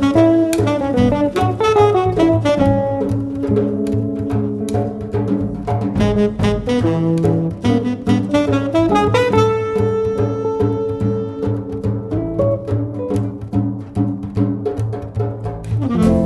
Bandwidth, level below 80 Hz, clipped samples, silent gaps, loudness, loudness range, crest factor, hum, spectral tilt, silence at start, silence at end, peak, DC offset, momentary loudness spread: 12.5 kHz; -36 dBFS; under 0.1%; none; -17 LUFS; 5 LU; 16 dB; none; -7.5 dB/octave; 0 s; 0 s; 0 dBFS; under 0.1%; 8 LU